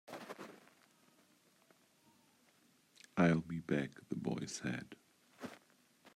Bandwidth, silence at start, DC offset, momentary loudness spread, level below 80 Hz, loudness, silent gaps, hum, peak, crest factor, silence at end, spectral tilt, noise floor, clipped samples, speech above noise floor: 14 kHz; 0.1 s; under 0.1%; 27 LU; -76 dBFS; -39 LUFS; none; none; -18 dBFS; 24 dB; 0.05 s; -6 dB/octave; -71 dBFS; under 0.1%; 33 dB